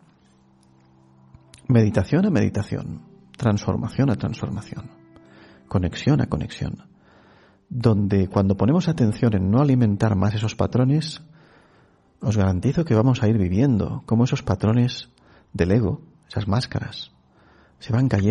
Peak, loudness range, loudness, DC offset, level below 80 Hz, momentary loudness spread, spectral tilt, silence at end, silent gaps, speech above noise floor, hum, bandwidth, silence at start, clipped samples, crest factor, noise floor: -4 dBFS; 6 LU; -22 LUFS; under 0.1%; -46 dBFS; 14 LU; -8 dB/octave; 0 s; none; 36 dB; none; 11 kHz; 1.7 s; under 0.1%; 18 dB; -57 dBFS